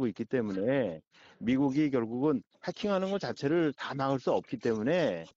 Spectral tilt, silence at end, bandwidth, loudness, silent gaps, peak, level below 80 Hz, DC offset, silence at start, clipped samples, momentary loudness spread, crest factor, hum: -5.5 dB/octave; 0.05 s; 7.6 kHz; -31 LUFS; 1.07-1.11 s; -16 dBFS; -66 dBFS; under 0.1%; 0 s; under 0.1%; 6 LU; 14 dB; none